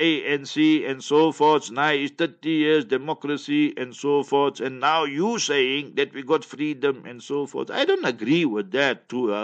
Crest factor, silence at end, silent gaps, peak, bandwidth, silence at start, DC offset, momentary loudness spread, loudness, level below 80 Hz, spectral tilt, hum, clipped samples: 18 dB; 0 s; none; -6 dBFS; 8.6 kHz; 0 s; under 0.1%; 8 LU; -23 LUFS; -76 dBFS; -4.5 dB/octave; none; under 0.1%